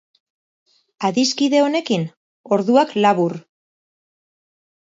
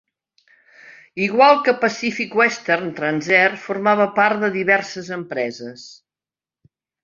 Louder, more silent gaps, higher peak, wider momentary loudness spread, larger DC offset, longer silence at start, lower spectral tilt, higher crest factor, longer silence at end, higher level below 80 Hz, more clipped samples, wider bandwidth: about the same, -18 LUFS vs -18 LUFS; first, 2.17-2.44 s vs none; about the same, -2 dBFS vs -2 dBFS; second, 8 LU vs 15 LU; neither; first, 1 s vs 0.85 s; about the same, -5 dB/octave vs -4.5 dB/octave; about the same, 18 dB vs 18 dB; first, 1.45 s vs 1.1 s; about the same, -72 dBFS vs -68 dBFS; neither; about the same, 7.8 kHz vs 7.6 kHz